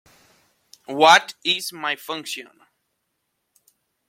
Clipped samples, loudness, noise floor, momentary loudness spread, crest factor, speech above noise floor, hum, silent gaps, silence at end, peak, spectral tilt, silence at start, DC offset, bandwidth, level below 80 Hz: under 0.1%; -19 LUFS; -75 dBFS; 19 LU; 22 dB; 55 dB; none; none; 1.65 s; -2 dBFS; -1.5 dB/octave; 0.9 s; under 0.1%; 16.5 kHz; -74 dBFS